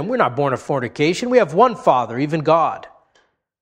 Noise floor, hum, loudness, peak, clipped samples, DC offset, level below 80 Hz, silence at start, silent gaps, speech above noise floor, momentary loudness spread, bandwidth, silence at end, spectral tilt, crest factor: -61 dBFS; none; -18 LUFS; 0 dBFS; under 0.1%; under 0.1%; -60 dBFS; 0 s; none; 44 dB; 7 LU; 10.5 kHz; 0.75 s; -6 dB/octave; 18 dB